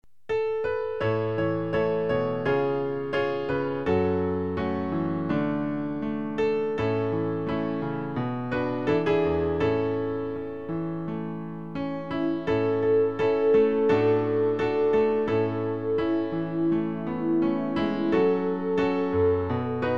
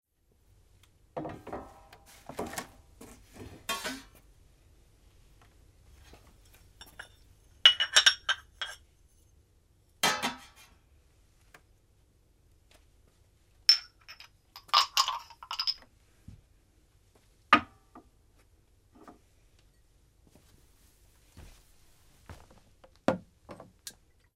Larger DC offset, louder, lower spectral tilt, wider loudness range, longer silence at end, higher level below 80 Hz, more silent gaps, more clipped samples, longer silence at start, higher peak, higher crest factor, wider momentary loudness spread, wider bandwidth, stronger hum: first, 0.5% vs under 0.1%; about the same, -26 LUFS vs -27 LUFS; first, -8.5 dB/octave vs -1 dB/octave; second, 5 LU vs 16 LU; second, 0 s vs 0.5 s; first, -54 dBFS vs -62 dBFS; neither; neither; second, 0.3 s vs 1.15 s; second, -10 dBFS vs -2 dBFS; second, 14 dB vs 32 dB; second, 7 LU vs 29 LU; second, 6.4 kHz vs 16 kHz; neither